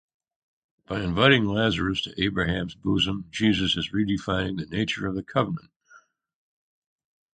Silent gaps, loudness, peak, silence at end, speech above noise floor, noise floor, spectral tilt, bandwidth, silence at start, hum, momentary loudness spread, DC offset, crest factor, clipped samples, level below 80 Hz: 5.76-5.80 s; -25 LUFS; -4 dBFS; 1.35 s; 32 dB; -57 dBFS; -5.5 dB/octave; 9.2 kHz; 0.9 s; none; 10 LU; under 0.1%; 24 dB; under 0.1%; -46 dBFS